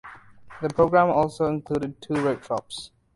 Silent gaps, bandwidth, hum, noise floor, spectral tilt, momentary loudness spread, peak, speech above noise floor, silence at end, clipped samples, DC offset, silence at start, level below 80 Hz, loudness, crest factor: none; 11.5 kHz; none; -45 dBFS; -6.5 dB/octave; 12 LU; -6 dBFS; 22 dB; 0.3 s; under 0.1%; under 0.1%; 0.05 s; -52 dBFS; -24 LUFS; 20 dB